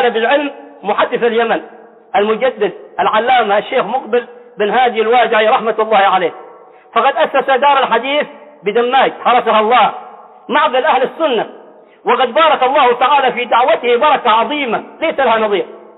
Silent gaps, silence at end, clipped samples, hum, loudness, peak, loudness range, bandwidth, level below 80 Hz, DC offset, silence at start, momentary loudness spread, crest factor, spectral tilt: none; 0.2 s; under 0.1%; none; -13 LUFS; -2 dBFS; 3 LU; 4.1 kHz; -60 dBFS; under 0.1%; 0 s; 8 LU; 12 dB; -7.5 dB/octave